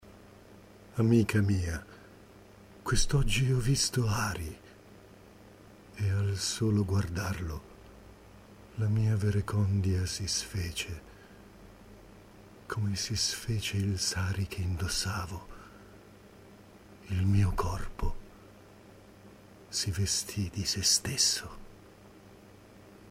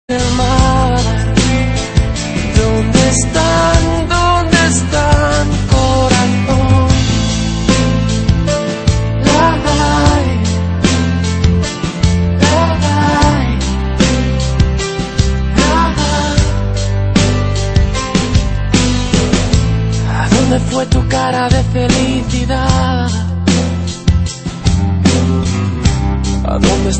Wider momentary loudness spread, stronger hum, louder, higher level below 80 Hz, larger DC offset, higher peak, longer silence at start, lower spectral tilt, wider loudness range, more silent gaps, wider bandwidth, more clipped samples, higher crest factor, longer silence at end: first, 17 LU vs 5 LU; neither; second, -30 LUFS vs -13 LUFS; second, -44 dBFS vs -18 dBFS; neither; second, -12 dBFS vs 0 dBFS; about the same, 0.05 s vs 0.1 s; about the same, -4 dB/octave vs -5 dB/octave; first, 5 LU vs 2 LU; neither; first, 15.5 kHz vs 8.8 kHz; neither; first, 20 dB vs 12 dB; about the same, 0 s vs 0 s